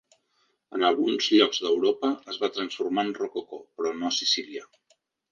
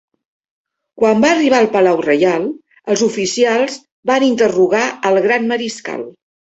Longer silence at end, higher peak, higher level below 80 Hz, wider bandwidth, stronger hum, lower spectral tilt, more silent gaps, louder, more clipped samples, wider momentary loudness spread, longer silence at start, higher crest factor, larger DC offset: first, 0.65 s vs 0.45 s; second, -6 dBFS vs 0 dBFS; second, -76 dBFS vs -58 dBFS; second, 7.4 kHz vs 8.2 kHz; neither; second, -2.5 dB/octave vs -4 dB/octave; second, none vs 3.92-4.03 s; second, -26 LUFS vs -14 LUFS; neither; first, 15 LU vs 12 LU; second, 0.7 s vs 0.95 s; first, 20 dB vs 14 dB; neither